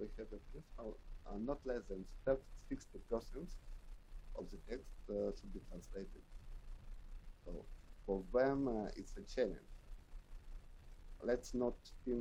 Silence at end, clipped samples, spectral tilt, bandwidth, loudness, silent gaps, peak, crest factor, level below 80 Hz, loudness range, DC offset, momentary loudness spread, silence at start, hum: 0 s; under 0.1%; -6.5 dB/octave; 12.5 kHz; -44 LUFS; none; -22 dBFS; 22 dB; -52 dBFS; 7 LU; under 0.1%; 21 LU; 0 s; none